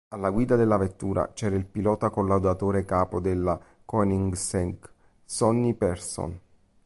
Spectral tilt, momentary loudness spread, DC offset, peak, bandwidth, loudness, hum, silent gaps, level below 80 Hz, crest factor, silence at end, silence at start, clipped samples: -6.5 dB/octave; 10 LU; under 0.1%; -8 dBFS; 11.5 kHz; -26 LUFS; none; none; -44 dBFS; 16 dB; 0.45 s; 0.1 s; under 0.1%